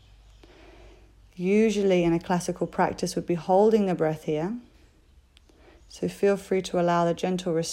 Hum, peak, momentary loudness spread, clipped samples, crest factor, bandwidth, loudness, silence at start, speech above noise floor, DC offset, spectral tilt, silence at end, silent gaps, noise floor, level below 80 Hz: none; -10 dBFS; 9 LU; under 0.1%; 16 dB; 15.5 kHz; -25 LUFS; 1.4 s; 33 dB; under 0.1%; -6 dB/octave; 0 s; none; -57 dBFS; -54 dBFS